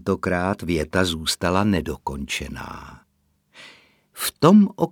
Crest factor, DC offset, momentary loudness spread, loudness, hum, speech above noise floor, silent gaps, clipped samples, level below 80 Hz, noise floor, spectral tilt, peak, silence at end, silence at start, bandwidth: 22 dB; under 0.1%; 17 LU; -21 LUFS; none; 46 dB; none; under 0.1%; -44 dBFS; -67 dBFS; -5 dB/octave; 0 dBFS; 0 s; 0.05 s; 20 kHz